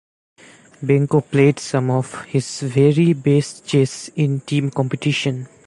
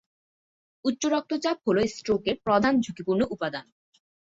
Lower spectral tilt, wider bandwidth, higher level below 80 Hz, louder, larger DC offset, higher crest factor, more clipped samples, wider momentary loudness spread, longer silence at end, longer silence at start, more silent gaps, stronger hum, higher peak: first, -6.5 dB/octave vs -5 dB/octave; first, 11.5 kHz vs 8 kHz; about the same, -60 dBFS vs -58 dBFS; first, -19 LUFS vs -26 LUFS; neither; about the same, 16 dB vs 18 dB; neither; about the same, 8 LU vs 9 LU; second, 0.2 s vs 0.7 s; about the same, 0.8 s vs 0.85 s; neither; neither; first, -2 dBFS vs -10 dBFS